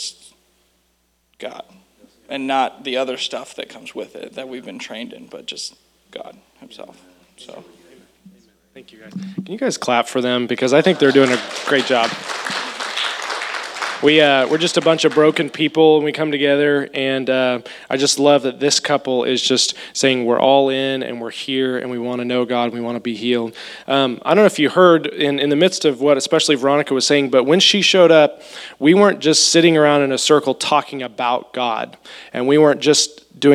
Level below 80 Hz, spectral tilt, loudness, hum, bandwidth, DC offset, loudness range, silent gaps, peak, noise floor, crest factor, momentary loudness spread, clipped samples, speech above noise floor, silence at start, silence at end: -68 dBFS; -3.5 dB/octave; -16 LUFS; none; 14 kHz; under 0.1%; 15 LU; none; 0 dBFS; -64 dBFS; 18 dB; 18 LU; under 0.1%; 47 dB; 0 s; 0 s